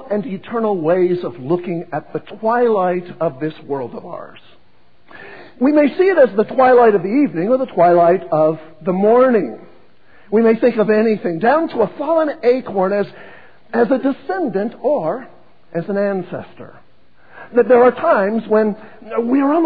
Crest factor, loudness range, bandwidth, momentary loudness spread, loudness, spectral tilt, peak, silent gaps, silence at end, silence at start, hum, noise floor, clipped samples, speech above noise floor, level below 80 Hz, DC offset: 16 dB; 8 LU; 5 kHz; 14 LU; -16 LUFS; -10 dB/octave; 0 dBFS; none; 0 s; 0 s; none; -56 dBFS; under 0.1%; 40 dB; -62 dBFS; 0.8%